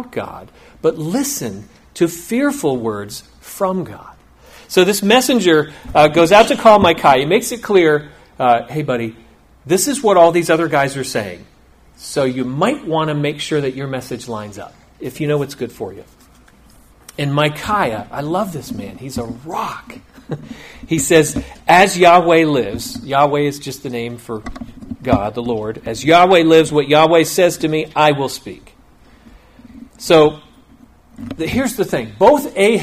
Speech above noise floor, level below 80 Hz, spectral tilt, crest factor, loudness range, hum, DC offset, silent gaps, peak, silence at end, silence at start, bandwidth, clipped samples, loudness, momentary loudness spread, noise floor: 33 dB; -44 dBFS; -4.5 dB/octave; 16 dB; 9 LU; none; under 0.1%; none; 0 dBFS; 0 s; 0 s; 16 kHz; under 0.1%; -15 LUFS; 19 LU; -48 dBFS